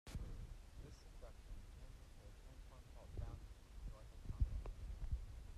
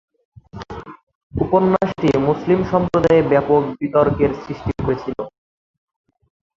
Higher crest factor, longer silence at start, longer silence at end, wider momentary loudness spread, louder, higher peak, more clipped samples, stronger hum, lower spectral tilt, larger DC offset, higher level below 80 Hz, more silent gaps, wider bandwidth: first, 24 dB vs 18 dB; second, 0.05 s vs 0.55 s; second, 0 s vs 1.25 s; second, 15 LU vs 19 LU; second, -54 LUFS vs -18 LUFS; second, -26 dBFS vs -2 dBFS; neither; neither; second, -6.5 dB/octave vs -8.5 dB/octave; neither; second, -50 dBFS vs -40 dBFS; second, none vs 1.03-1.07 s, 1.15-1.30 s; first, 13.5 kHz vs 7.6 kHz